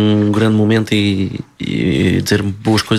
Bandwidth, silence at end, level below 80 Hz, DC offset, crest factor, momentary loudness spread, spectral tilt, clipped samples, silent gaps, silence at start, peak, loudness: 14 kHz; 0 s; -42 dBFS; under 0.1%; 12 dB; 8 LU; -6 dB/octave; under 0.1%; none; 0 s; -2 dBFS; -15 LUFS